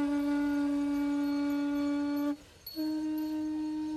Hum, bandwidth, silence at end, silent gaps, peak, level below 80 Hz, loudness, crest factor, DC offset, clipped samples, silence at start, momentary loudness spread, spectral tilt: none; 12.5 kHz; 0 s; none; -24 dBFS; -62 dBFS; -32 LUFS; 8 dB; under 0.1%; under 0.1%; 0 s; 5 LU; -5 dB/octave